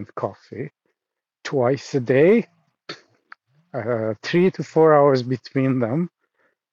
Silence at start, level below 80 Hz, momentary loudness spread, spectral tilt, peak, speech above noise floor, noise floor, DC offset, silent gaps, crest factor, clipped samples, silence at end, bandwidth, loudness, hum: 0 s; -72 dBFS; 21 LU; -7.5 dB/octave; -4 dBFS; 66 dB; -86 dBFS; under 0.1%; none; 18 dB; under 0.1%; 0.65 s; 7.6 kHz; -20 LUFS; none